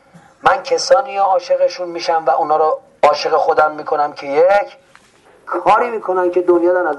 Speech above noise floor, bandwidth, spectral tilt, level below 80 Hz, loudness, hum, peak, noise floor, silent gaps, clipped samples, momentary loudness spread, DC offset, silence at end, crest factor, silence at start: 34 dB; 10.5 kHz; -3.5 dB/octave; -56 dBFS; -15 LUFS; none; -2 dBFS; -49 dBFS; none; under 0.1%; 5 LU; under 0.1%; 0 s; 14 dB; 0.45 s